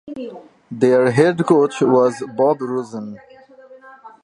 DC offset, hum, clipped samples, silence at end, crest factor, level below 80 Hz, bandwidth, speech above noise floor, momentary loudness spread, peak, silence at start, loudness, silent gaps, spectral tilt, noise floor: under 0.1%; none; under 0.1%; 0.15 s; 18 dB; -64 dBFS; 11 kHz; 27 dB; 18 LU; -2 dBFS; 0.05 s; -16 LUFS; none; -7 dB/octave; -44 dBFS